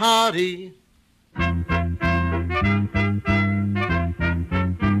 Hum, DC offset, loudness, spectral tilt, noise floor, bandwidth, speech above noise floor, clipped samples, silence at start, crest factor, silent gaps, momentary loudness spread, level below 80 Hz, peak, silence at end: none; under 0.1%; -22 LUFS; -5.5 dB/octave; -60 dBFS; 14.5 kHz; 39 dB; under 0.1%; 0 s; 16 dB; none; 5 LU; -34 dBFS; -6 dBFS; 0 s